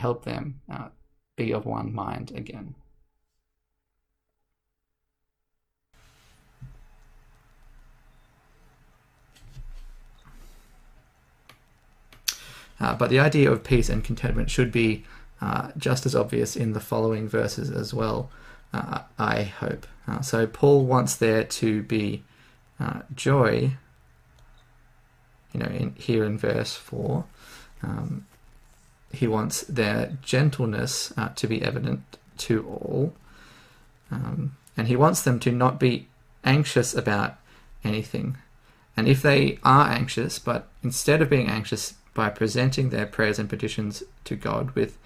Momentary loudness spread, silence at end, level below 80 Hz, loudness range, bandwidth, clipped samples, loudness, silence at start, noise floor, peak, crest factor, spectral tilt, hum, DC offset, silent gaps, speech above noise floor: 14 LU; 0.05 s; -44 dBFS; 8 LU; 16 kHz; under 0.1%; -25 LUFS; 0 s; -80 dBFS; -2 dBFS; 24 dB; -5.5 dB/octave; none; under 0.1%; none; 56 dB